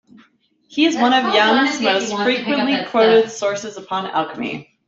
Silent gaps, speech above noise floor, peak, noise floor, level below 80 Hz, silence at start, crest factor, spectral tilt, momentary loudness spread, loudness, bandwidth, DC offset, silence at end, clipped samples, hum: none; 40 dB; -2 dBFS; -57 dBFS; -64 dBFS; 0.7 s; 16 dB; -3.5 dB/octave; 12 LU; -17 LUFS; 7.8 kHz; under 0.1%; 0.25 s; under 0.1%; none